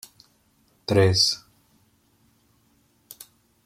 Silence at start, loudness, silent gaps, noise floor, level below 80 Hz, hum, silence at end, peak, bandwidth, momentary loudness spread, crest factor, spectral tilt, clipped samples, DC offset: 0.9 s; -21 LUFS; none; -64 dBFS; -60 dBFS; none; 2.3 s; -6 dBFS; 16 kHz; 26 LU; 22 dB; -4 dB/octave; under 0.1%; under 0.1%